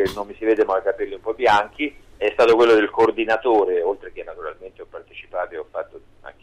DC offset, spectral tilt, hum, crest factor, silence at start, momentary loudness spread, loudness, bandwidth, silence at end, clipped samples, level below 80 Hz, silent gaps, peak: under 0.1%; -5 dB/octave; none; 14 dB; 0 s; 20 LU; -20 LUFS; 11.5 kHz; 0.1 s; under 0.1%; -50 dBFS; none; -8 dBFS